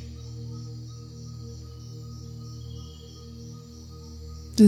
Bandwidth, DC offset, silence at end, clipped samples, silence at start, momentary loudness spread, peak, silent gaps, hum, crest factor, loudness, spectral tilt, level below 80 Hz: 14.5 kHz; under 0.1%; 0 s; under 0.1%; 0 s; 5 LU; -6 dBFS; none; none; 22 dB; -40 LUFS; -7 dB/octave; -50 dBFS